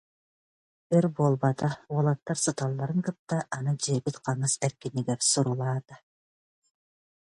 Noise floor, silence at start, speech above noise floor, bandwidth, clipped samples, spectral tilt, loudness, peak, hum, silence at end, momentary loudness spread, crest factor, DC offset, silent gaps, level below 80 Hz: under -90 dBFS; 0.9 s; over 63 dB; 11.5 kHz; under 0.1%; -5 dB/octave; -28 LUFS; -10 dBFS; none; 1.25 s; 7 LU; 20 dB; under 0.1%; 3.19-3.27 s; -68 dBFS